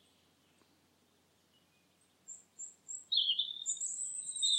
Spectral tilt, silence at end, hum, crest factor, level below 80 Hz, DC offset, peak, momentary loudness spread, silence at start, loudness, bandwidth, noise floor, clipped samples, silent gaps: 3.5 dB/octave; 0 s; none; 20 dB; under -90 dBFS; under 0.1%; -20 dBFS; 21 LU; 2.3 s; -34 LUFS; 16 kHz; -72 dBFS; under 0.1%; none